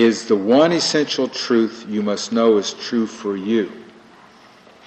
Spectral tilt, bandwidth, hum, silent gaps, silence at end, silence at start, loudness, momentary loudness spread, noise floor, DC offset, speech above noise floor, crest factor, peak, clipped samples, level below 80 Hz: -4.5 dB/octave; 8.6 kHz; none; none; 1.05 s; 0 s; -19 LUFS; 9 LU; -47 dBFS; under 0.1%; 29 dB; 16 dB; -2 dBFS; under 0.1%; -66 dBFS